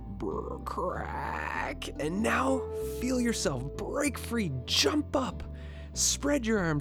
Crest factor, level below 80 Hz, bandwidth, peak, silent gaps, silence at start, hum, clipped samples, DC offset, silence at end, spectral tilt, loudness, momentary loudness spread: 20 dB; -44 dBFS; 19.5 kHz; -12 dBFS; none; 0 s; none; under 0.1%; under 0.1%; 0 s; -3.5 dB/octave; -30 LUFS; 10 LU